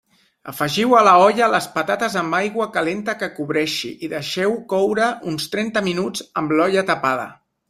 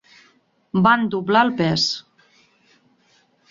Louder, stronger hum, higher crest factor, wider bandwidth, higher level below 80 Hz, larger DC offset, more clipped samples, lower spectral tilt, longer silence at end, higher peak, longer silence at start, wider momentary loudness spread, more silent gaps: about the same, -19 LUFS vs -19 LUFS; neither; about the same, 18 dB vs 20 dB; first, 15.5 kHz vs 7.8 kHz; about the same, -62 dBFS vs -58 dBFS; neither; neither; about the same, -4.5 dB/octave vs -5 dB/octave; second, 0.35 s vs 1.5 s; about the same, -2 dBFS vs -2 dBFS; second, 0.45 s vs 0.75 s; first, 12 LU vs 7 LU; neither